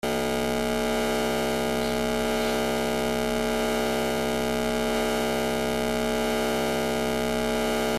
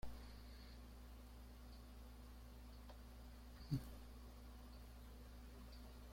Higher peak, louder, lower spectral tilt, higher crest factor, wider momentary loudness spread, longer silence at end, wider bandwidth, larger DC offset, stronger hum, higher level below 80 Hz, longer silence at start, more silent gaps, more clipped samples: first, -12 dBFS vs -30 dBFS; first, -26 LUFS vs -57 LUFS; second, -4 dB/octave vs -6 dB/octave; second, 14 dB vs 24 dB; second, 1 LU vs 12 LU; about the same, 0 s vs 0 s; about the same, 16 kHz vs 16.5 kHz; neither; neither; first, -40 dBFS vs -58 dBFS; about the same, 0.05 s vs 0 s; neither; neither